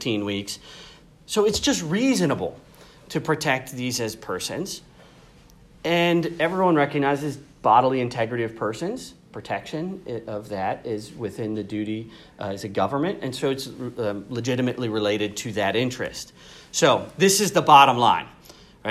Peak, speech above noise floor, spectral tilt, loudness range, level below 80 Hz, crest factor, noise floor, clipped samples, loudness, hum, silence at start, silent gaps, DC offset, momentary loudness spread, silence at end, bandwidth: 0 dBFS; 28 dB; -4 dB/octave; 10 LU; -56 dBFS; 24 dB; -51 dBFS; under 0.1%; -23 LUFS; none; 0 s; none; under 0.1%; 15 LU; 0 s; 15.5 kHz